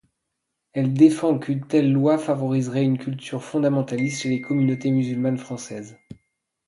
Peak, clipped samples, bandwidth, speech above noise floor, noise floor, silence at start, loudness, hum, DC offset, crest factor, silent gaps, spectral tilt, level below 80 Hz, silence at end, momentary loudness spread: -4 dBFS; under 0.1%; 11.5 kHz; 58 dB; -79 dBFS; 0.75 s; -22 LUFS; none; under 0.1%; 18 dB; none; -7 dB/octave; -66 dBFS; 0.55 s; 15 LU